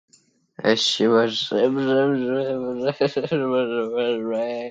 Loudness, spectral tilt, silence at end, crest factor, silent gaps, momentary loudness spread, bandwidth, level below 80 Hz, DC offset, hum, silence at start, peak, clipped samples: -22 LUFS; -4.5 dB/octave; 0 s; 18 dB; none; 7 LU; 9.2 kHz; -66 dBFS; under 0.1%; none; 0.6 s; -4 dBFS; under 0.1%